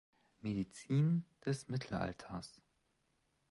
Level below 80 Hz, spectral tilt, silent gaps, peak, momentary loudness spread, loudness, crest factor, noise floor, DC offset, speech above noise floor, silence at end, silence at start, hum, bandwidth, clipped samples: -66 dBFS; -7 dB/octave; none; -24 dBFS; 14 LU; -39 LUFS; 16 dB; -80 dBFS; under 0.1%; 41 dB; 1 s; 0.45 s; none; 11.5 kHz; under 0.1%